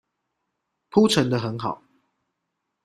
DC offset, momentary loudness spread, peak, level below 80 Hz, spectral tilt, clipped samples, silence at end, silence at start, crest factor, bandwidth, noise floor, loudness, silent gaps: under 0.1%; 13 LU; -4 dBFS; -62 dBFS; -5.5 dB/octave; under 0.1%; 1.1 s; 0.95 s; 22 dB; 14 kHz; -80 dBFS; -22 LUFS; none